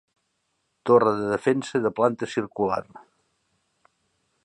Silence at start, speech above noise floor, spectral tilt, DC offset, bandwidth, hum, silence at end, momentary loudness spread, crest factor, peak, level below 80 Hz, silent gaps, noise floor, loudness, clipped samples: 0.85 s; 52 dB; -6.5 dB/octave; under 0.1%; 9.8 kHz; none; 1.45 s; 10 LU; 20 dB; -4 dBFS; -64 dBFS; none; -74 dBFS; -24 LUFS; under 0.1%